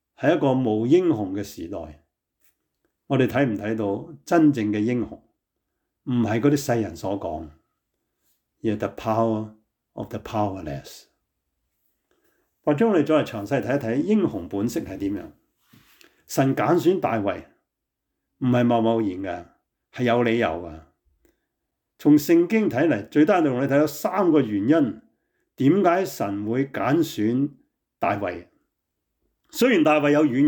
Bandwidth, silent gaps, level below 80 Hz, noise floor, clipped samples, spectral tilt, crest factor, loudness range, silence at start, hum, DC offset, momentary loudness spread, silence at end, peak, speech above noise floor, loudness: 19.5 kHz; none; -60 dBFS; -82 dBFS; under 0.1%; -6.5 dB/octave; 16 dB; 7 LU; 0.2 s; none; under 0.1%; 15 LU; 0 s; -8 dBFS; 60 dB; -22 LUFS